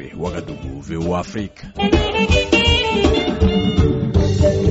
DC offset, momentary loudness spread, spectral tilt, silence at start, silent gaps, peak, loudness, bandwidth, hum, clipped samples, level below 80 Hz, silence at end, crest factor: under 0.1%; 14 LU; -4.5 dB/octave; 0 s; none; -4 dBFS; -17 LUFS; 8 kHz; none; under 0.1%; -26 dBFS; 0 s; 14 dB